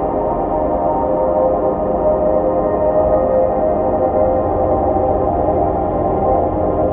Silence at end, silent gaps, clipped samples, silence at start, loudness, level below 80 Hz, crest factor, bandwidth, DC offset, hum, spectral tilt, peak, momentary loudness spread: 0 s; none; under 0.1%; 0 s; -16 LUFS; -30 dBFS; 12 dB; 3.5 kHz; under 0.1%; none; -10 dB/octave; -2 dBFS; 3 LU